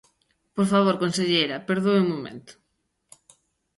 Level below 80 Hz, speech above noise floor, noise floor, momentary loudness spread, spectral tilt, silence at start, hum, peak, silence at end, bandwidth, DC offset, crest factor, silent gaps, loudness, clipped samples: -68 dBFS; 52 dB; -74 dBFS; 15 LU; -5.5 dB/octave; 0.55 s; none; -8 dBFS; 1.25 s; 11.5 kHz; under 0.1%; 18 dB; none; -23 LUFS; under 0.1%